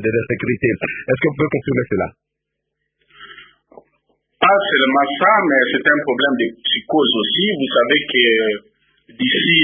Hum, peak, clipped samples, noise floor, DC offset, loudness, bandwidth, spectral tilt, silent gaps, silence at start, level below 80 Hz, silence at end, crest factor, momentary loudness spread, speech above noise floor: none; 0 dBFS; under 0.1%; -77 dBFS; under 0.1%; -16 LUFS; 3.8 kHz; -10 dB/octave; none; 0 s; -52 dBFS; 0 s; 18 dB; 8 LU; 61 dB